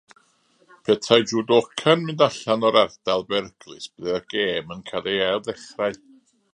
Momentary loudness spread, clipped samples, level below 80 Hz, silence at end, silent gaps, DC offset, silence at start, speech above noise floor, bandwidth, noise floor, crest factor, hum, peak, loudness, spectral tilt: 14 LU; under 0.1%; -62 dBFS; 0.6 s; none; under 0.1%; 0.9 s; 40 dB; 10.5 kHz; -62 dBFS; 22 dB; none; 0 dBFS; -22 LUFS; -4.5 dB/octave